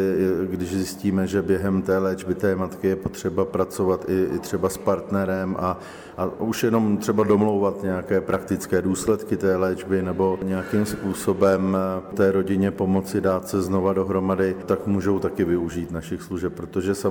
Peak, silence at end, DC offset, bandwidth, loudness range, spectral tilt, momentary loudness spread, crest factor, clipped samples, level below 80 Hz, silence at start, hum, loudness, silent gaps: -6 dBFS; 0 s; under 0.1%; 19.5 kHz; 2 LU; -6.5 dB/octave; 6 LU; 16 dB; under 0.1%; -50 dBFS; 0 s; none; -23 LUFS; none